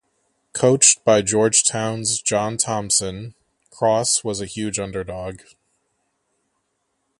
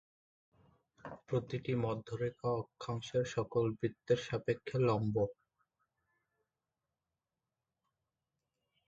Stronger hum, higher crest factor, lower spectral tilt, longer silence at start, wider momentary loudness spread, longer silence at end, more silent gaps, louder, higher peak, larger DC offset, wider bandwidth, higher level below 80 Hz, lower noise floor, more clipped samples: neither; about the same, 22 dB vs 20 dB; second, -3 dB/octave vs -7 dB/octave; second, 0.55 s vs 1.05 s; first, 18 LU vs 8 LU; second, 1.85 s vs 3.55 s; neither; first, -18 LUFS vs -37 LUFS; first, 0 dBFS vs -20 dBFS; neither; first, 11.5 kHz vs 7.8 kHz; first, -52 dBFS vs -68 dBFS; second, -72 dBFS vs under -90 dBFS; neither